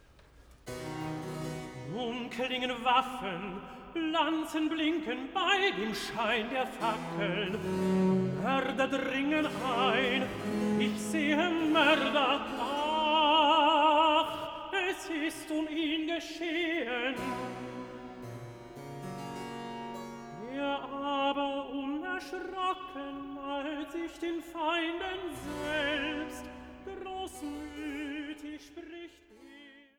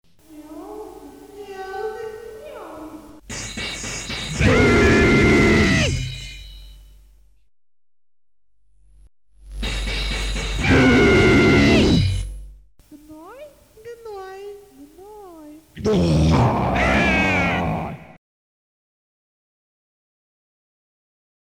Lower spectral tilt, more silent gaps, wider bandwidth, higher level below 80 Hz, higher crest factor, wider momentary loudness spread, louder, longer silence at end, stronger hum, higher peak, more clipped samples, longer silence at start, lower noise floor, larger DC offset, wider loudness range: about the same, -4.5 dB/octave vs -5.5 dB/octave; neither; first, 19.5 kHz vs 16.5 kHz; second, -60 dBFS vs -32 dBFS; about the same, 20 dB vs 18 dB; second, 17 LU vs 24 LU; second, -31 LUFS vs -18 LUFS; second, 0.2 s vs 3.5 s; neither; second, -12 dBFS vs -4 dBFS; neither; about the same, 0.35 s vs 0.3 s; second, -58 dBFS vs -69 dBFS; neither; second, 11 LU vs 18 LU